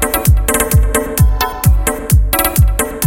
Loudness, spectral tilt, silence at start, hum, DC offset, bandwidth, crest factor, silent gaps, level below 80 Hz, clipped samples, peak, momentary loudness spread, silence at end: -13 LUFS; -4.5 dB/octave; 0 s; none; under 0.1%; 17.5 kHz; 12 dB; none; -14 dBFS; under 0.1%; 0 dBFS; 3 LU; 0 s